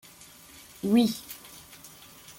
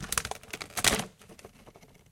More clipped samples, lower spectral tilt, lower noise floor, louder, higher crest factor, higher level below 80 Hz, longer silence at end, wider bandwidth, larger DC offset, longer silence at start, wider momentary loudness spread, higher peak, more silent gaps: neither; first, -5 dB/octave vs -1.5 dB/octave; second, -51 dBFS vs -55 dBFS; first, -26 LUFS vs -29 LUFS; second, 20 dB vs 34 dB; second, -66 dBFS vs -50 dBFS; second, 0.1 s vs 0.35 s; about the same, 17 kHz vs 17 kHz; neither; first, 0.85 s vs 0 s; about the same, 24 LU vs 25 LU; second, -12 dBFS vs -2 dBFS; neither